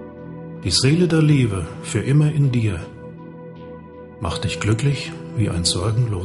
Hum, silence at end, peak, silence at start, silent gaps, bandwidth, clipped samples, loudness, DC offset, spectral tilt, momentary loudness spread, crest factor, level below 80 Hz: none; 0 s; -4 dBFS; 0 s; none; 11.5 kHz; under 0.1%; -20 LUFS; under 0.1%; -5.5 dB/octave; 21 LU; 16 dB; -42 dBFS